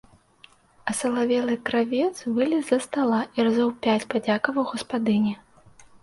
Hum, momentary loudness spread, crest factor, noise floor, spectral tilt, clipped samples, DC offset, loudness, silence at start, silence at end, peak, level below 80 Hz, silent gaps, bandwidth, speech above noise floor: none; 5 LU; 20 dB; -55 dBFS; -5 dB/octave; under 0.1%; under 0.1%; -24 LUFS; 0.85 s; 0.65 s; -6 dBFS; -64 dBFS; none; 11.5 kHz; 32 dB